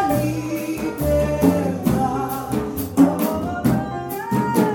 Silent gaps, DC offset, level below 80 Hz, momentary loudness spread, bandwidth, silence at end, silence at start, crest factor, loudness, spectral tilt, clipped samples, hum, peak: none; under 0.1%; -38 dBFS; 8 LU; 17.5 kHz; 0 s; 0 s; 18 dB; -21 LUFS; -7 dB/octave; under 0.1%; none; -2 dBFS